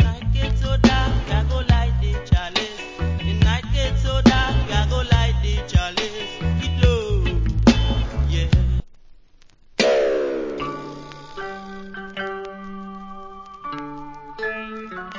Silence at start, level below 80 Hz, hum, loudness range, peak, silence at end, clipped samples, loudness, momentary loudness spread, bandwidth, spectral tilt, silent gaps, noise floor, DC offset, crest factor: 0 s; -24 dBFS; none; 12 LU; 0 dBFS; 0 s; under 0.1%; -21 LUFS; 18 LU; 7.6 kHz; -6 dB/octave; none; -49 dBFS; under 0.1%; 20 dB